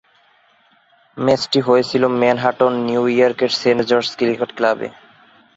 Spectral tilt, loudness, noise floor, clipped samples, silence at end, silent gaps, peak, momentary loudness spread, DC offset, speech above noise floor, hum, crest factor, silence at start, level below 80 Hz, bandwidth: -5 dB/octave; -17 LUFS; -56 dBFS; under 0.1%; 0.65 s; none; -2 dBFS; 5 LU; under 0.1%; 39 dB; none; 16 dB; 1.15 s; -58 dBFS; 8 kHz